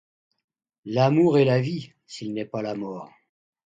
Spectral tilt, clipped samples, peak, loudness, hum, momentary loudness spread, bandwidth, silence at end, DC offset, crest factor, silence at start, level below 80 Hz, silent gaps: -7.5 dB/octave; under 0.1%; -8 dBFS; -23 LUFS; none; 20 LU; 7.8 kHz; 0.7 s; under 0.1%; 18 dB; 0.85 s; -66 dBFS; none